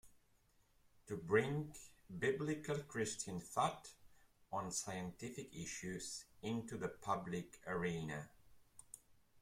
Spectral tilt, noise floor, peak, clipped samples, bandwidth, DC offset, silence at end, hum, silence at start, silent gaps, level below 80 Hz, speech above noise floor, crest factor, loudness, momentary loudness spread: -4.5 dB/octave; -75 dBFS; -22 dBFS; under 0.1%; 16.5 kHz; under 0.1%; 0 s; none; 0.05 s; none; -72 dBFS; 32 dB; 24 dB; -43 LUFS; 17 LU